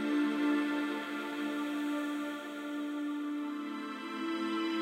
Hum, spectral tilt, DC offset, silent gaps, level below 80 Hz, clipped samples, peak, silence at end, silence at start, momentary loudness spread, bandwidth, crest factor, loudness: none; -4 dB/octave; under 0.1%; none; under -90 dBFS; under 0.1%; -20 dBFS; 0 s; 0 s; 9 LU; 16 kHz; 14 dB; -35 LUFS